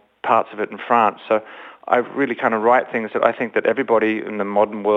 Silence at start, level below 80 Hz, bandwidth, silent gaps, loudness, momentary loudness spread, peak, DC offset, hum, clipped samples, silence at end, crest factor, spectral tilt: 0.25 s; -66 dBFS; 7.6 kHz; none; -19 LUFS; 7 LU; -2 dBFS; under 0.1%; none; under 0.1%; 0 s; 18 dB; -7.5 dB/octave